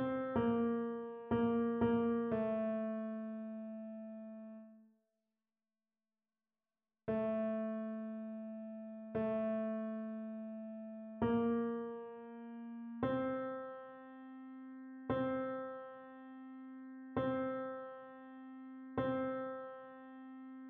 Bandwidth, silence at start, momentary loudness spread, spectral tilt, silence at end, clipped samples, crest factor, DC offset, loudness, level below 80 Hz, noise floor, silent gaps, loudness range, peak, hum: 3.8 kHz; 0 s; 17 LU; -7 dB/octave; 0 s; under 0.1%; 18 dB; under 0.1%; -40 LUFS; -70 dBFS; under -90 dBFS; none; 8 LU; -22 dBFS; none